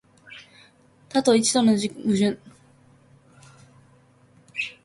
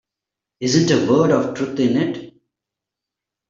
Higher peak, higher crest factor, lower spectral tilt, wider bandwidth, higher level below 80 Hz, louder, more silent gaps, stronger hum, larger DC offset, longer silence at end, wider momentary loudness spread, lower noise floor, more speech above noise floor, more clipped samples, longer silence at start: second, -6 dBFS vs -2 dBFS; about the same, 20 dB vs 18 dB; second, -4 dB/octave vs -5.5 dB/octave; first, 11.5 kHz vs 7.8 kHz; second, -66 dBFS vs -58 dBFS; second, -22 LUFS vs -18 LUFS; neither; neither; neither; second, 0.15 s vs 1.2 s; first, 25 LU vs 10 LU; second, -56 dBFS vs -85 dBFS; second, 36 dB vs 68 dB; neither; second, 0.3 s vs 0.6 s